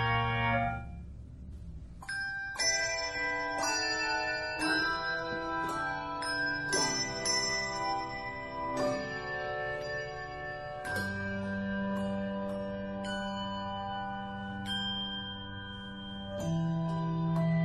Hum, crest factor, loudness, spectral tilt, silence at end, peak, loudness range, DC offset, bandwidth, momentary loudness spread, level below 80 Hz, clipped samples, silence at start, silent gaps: none; 16 dB; -33 LUFS; -3.5 dB/octave; 0 s; -18 dBFS; 5 LU; under 0.1%; 13.5 kHz; 12 LU; -52 dBFS; under 0.1%; 0 s; none